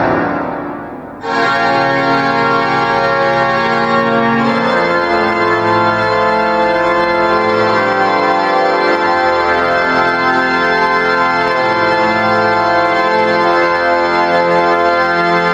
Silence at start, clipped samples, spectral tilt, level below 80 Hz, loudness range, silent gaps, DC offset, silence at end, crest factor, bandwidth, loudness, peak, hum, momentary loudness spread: 0 s; under 0.1%; -5.5 dB/octave; -46 dBFS; 1 LU; none; under 0.1%; 0 s; 12 dB; 8.8 kHz; -12 LUFS; 0 dBFS; none; 1 LU